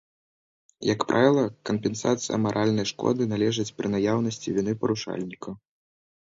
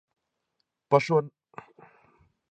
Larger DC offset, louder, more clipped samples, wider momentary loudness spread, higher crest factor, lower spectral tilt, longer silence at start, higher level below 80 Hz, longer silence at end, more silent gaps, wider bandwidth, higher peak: neither; about the same, -26 LUFS vs -25 LUFS; neither; second, 12 LU vs 25 LU; about the same, 20 dB vs 24 dB; second, -5.5 dB/octave vs -7 dB/octave; about the same, 0.8 s vs 0.9 s; first, -62 dBFS vs -74 dBFS; second, 0.75 s vs 1.25 s; neither; second, 7.8 kHz vs 8.6 kHz; about the same, -6 dBFS vs -6 dBFS